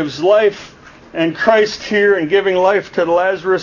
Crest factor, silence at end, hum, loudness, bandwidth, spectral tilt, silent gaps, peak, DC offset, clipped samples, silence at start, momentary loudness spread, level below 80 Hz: 14 dB; 0 s; none; -14 LUFS; 7.4 kHz; -5 dB/octave; none; 0 dBFS; under 0.1%; under 0.1%; 0 s; 7 LU; -52 dBFS